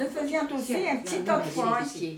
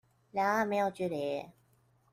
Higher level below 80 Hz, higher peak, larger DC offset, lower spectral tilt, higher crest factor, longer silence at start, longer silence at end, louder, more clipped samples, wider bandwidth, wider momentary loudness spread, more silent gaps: first, -68 dBFS vs -74 dBFS; first, -12 dBFS vs -18 dBFS; neither; about the same, -4.5 dB/octave vs -5.5 dB/octave; about the same, 16 dB vs 16 dB; second, 0 s vs 0.35 s; second, 0 s vs 0.6 s; first, -28 LUFS vs -33 LUFS; neither; first, 19 kHz vs 16 kHz; second, 3 LU vs 11 LU; neither